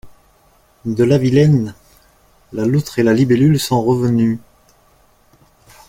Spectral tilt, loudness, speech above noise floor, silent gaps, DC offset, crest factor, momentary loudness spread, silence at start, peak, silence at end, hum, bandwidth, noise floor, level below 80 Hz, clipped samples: -7 dB/octave; -15 LUFS; 40 dB; none; under 0.1%; 16 dB; 14 LU; 0.05 s; -2 dBFS; 1.5 s; none; 16.5 kHz; -53 dBFS; -48 dBFS; under 0.1%